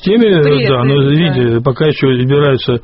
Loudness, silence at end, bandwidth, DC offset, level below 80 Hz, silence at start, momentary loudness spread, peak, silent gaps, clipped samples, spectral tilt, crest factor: -11 LUFS; 0.05 s; 5.8 kHz; under 0.1%; -40 dBFS; 0 s; 3 LU; 0 dBFS; none; under 0.1%; -6 dB/octave; 10 dB